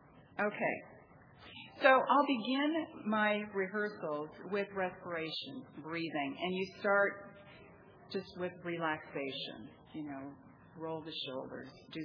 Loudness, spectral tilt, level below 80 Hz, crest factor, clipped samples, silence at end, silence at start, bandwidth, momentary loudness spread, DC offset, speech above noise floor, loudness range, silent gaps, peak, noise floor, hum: -36 LUFS; -7 dB/octave; -76 dBFS; 24 dB; under 0.1%; 0 s; 0.15 s; 5.4 kHz; 18 LU; under 0.1%; 23 dB; 10 LU; none; -12 dBFS; -59 dBFS; none